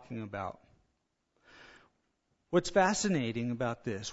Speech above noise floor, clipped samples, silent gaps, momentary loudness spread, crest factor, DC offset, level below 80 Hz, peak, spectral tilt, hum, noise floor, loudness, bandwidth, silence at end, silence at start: 48 dB; under 0.1%; none; 13 LU; 22 dB; under 0.1%; -62 dBFS; -12 dBFS; -4.5 dB/octave; none; -80 dBFS; -32 LUFS; 7.6 kHz; 0 s; 0 s